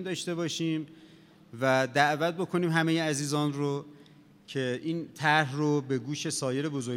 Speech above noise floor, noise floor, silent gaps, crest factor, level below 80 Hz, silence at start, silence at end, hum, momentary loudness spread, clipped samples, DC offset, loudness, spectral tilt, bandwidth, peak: 27 dB; -56 dBFS; none; 22 dB; -80 dBFS; 0 s; 0 s; none; 9 LU; under 0.1%; under 0.1%; -29 LUFS; -5 dB/octave; 16.5 kHz; -8 dBFS